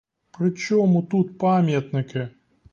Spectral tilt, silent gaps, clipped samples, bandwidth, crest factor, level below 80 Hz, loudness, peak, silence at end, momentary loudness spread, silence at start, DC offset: -7.5 dB/octave; none; under 0.1%; 7.2 kHz; 12 dB; -62 dBFS; -22 LUFS; -10 dBFS; 0.45 s; 11 LU; 0.4 s; under 0.1%